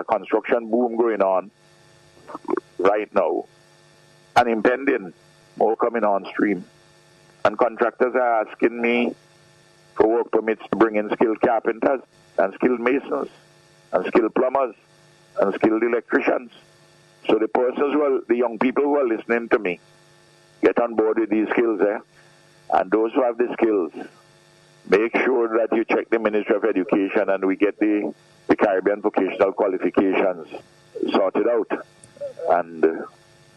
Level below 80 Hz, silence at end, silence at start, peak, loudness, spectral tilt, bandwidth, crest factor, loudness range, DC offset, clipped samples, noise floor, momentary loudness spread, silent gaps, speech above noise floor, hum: -64 dBFS; 0.45 s; 0 s; -4 dBFS; -21 LUFS; -6.5 dB/octave; 10 kHz; 18 dB; 2 LU; under 0.1%; under 0.1%; -53 dBFS; 9 LU; none; 33 dB; none